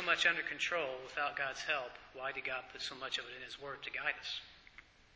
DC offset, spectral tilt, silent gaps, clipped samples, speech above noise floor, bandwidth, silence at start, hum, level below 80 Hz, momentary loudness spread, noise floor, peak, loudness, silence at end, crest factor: under 0.1%; -1.5 dB/octave; none; under 0.1%; 21 dB; 8 kHz; 0 s; none; -72 dBFS; 13 LU; -61 dBFS; -18 dBFS; -38 LUFS; 0.35 s; 22 dB